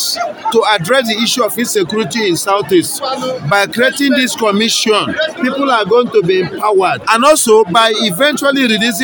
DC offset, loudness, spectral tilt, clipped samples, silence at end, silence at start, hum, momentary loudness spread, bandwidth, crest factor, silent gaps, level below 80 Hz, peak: under 0.1%; -12 LUFS; -3 dB/octave; 0.2%; 0 s; 0 s; none; 7 LU; 18 kHz; 12 dB; none; -56 dBFS; 0 dBFS